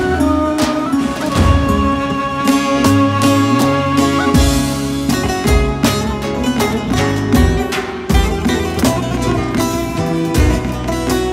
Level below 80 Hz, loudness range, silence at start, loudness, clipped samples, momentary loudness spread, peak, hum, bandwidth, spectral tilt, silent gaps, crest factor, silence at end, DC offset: -22 dBFS; 3 LU; 0 s; -15 LUFS; under 0.1%; 5 LU; 0 dBFS; none; 16.5 kHz; -5.5 dB/octave; none; 14 dB; 0 s; under 0.1%